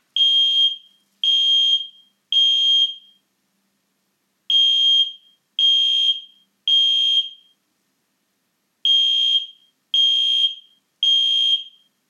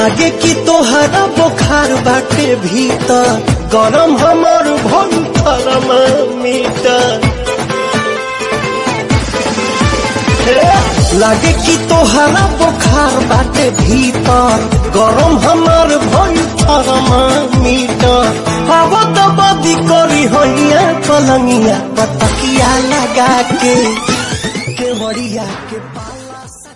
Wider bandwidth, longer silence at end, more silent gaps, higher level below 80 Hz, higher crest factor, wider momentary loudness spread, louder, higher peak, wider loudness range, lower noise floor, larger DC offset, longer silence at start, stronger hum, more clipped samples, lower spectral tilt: second, 10 kHz vs 11.5 kHz; first, 0.4 s vs 0.05 s; neither; second, under -90 dBFS vs -24 dBFS; about the same, 12 dB vs 10 dB; about the same, 9 LU vs 7 LU; second, -15 LUFS vs -10 LUFS; second, -8 dBFS vs 0 dBFS; about the same, 3 LU vs 4 LU; first, -70 dBFS vs -30 dBFS; second, under 0.1% vs 0.2%; first, 0.15 s vs 0 s; neither; neither; second, 6 dB/octave vs -4.5 dB/octave